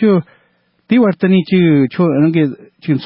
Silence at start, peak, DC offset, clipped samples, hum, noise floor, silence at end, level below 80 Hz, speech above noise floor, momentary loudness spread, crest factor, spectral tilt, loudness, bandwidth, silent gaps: 0 s; -2 dBFS; under 0.1%; under 0.1%; none; -58 dBFS; 0 s; -58 dBFS; 46 dB; 7 LU; 12 dB; -13 dB/octave; -13 LUFS; 5.6 kHz; none